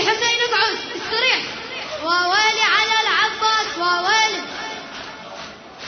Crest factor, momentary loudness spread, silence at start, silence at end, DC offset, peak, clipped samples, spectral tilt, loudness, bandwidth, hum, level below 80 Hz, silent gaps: 18 dB; 17 LU; 0 s; 0 s; under 0.1%; -2 dBFS; under 0.1%; -0.5 dB/octave; -18 LUFS; 6.6 kHz; none; -58 dBFS; none